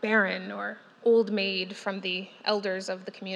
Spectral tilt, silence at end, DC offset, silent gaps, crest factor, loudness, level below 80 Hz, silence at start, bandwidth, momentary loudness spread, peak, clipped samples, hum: -4.5 dB/octave; 0 s; under 0.1%; none; 18 dB; -28 LUFS; under -90 dBFS; 0 s; 10.5 kHz; 12 LU; -10 dBFS; under 0.1%; none